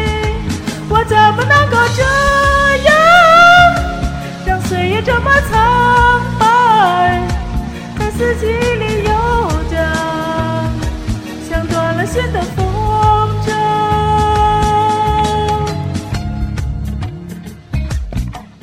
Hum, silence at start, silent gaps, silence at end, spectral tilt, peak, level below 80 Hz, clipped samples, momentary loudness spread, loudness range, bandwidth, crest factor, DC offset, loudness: none; 0 s; none; 0.15 s; -5 dB/octave; 0 dBFS; -24 dBFS; under 0.1%; 13 LU; 8 LU; 16.5 kHz; 12 dB; under 0.1%; -13 LUFS